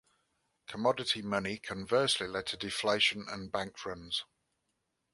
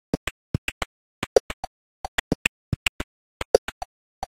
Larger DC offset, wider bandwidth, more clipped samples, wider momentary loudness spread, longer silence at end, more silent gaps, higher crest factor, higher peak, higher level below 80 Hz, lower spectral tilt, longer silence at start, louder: neither; second, 11.5 kHz vs 16.5 kHz; neither; second, 12 LU vs 17 LU; first, 0.9 s vs 0.1 s; second, none vs 0.17-4.22 s; about the same, 22 dB vs 26 dB; second, -12 dBFS vs -2 dBFS; second, -66 dBFS vs -44 dBFS; about the same, -3 dB/octave vs -4 dB/octave; first, 0.7 s vs 0.15 s; second, -33 LUFS vs -27 LUFS